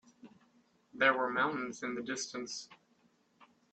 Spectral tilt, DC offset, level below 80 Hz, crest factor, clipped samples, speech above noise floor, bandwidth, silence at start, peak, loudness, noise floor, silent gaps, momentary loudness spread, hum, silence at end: -2.5 dB/octave; under 0.1%; -80 dBFS; 24 dB; under 0.1%; 37 dB; 8.8 kHz; 0.25 s; -14 dBFS; -34 LUFS; -71 dBFS; none; 14 LU; none; 0.3 s